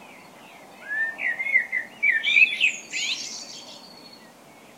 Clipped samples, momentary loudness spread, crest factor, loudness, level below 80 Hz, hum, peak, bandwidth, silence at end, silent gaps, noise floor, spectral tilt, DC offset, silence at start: under 0.1%; 23 LU; 22 dB; -21 LUFS; -78 dBFS; none; -6 dBFS; 16 kHz; 0.1 s; none; -49 dBFS; 1 dB/octave; under 0.1%; 0 s